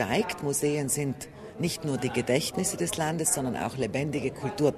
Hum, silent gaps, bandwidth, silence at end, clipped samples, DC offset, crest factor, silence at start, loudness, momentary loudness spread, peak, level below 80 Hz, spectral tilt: none; none; 13.5 kHz; 0 s; under 0.1%; under 0.1%; 20 dB; 0 s; -28 LUFS; 6 LU; -8 dBFS; -56 dBFS; -4 dB/octave